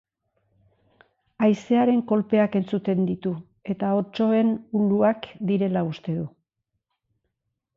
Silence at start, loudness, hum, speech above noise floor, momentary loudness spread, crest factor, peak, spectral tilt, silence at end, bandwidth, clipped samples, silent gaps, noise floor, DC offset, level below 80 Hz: 1.4 s; -23 LUFS; none; 57 dB; 10 LU; 16 dB; -8 dBFS; -8.5 dB/octave; 1.5 s; 7 kHz; under 0.1%; none; -80 dBFS; under 0.1%; -64 dBFS